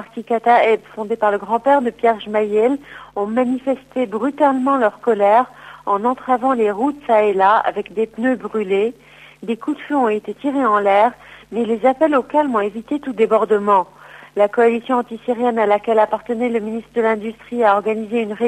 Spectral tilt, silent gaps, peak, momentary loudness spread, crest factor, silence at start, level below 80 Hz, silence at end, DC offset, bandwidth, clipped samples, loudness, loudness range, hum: -6.5 dB/octave; none; -2 dBFS; 9 LU; 14 dB; 0 s; -60 dBFS; 0 s; under 0.1%; 9.4 kHz; under 0.1%; -18 LUFS; 2 LU; none